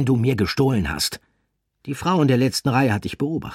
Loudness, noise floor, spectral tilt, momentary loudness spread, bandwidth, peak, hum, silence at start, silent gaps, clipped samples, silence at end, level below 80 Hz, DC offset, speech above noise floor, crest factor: -21 LUFS; -72 dBFS; -5.5 dB/octave; 9 LU; 16 kHz; -6 dBFS; none; 0 s; none; under 0.1%; 0 s; -44 dBFS; under 0.1%; 51 dB; 16 dB